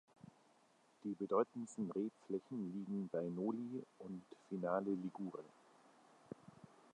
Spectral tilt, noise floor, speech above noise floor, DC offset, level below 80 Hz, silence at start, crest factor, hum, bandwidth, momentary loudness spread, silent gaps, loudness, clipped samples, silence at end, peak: -8 dB/octave; -73 dBFS; 30 dB; under 0.1%; -88 dBFS; 1.05 s; 22 dB; none; 10.5 kHz; 20 LU; none; -44 LUFS; under 0.1%; 0.3 s; -24 dBFS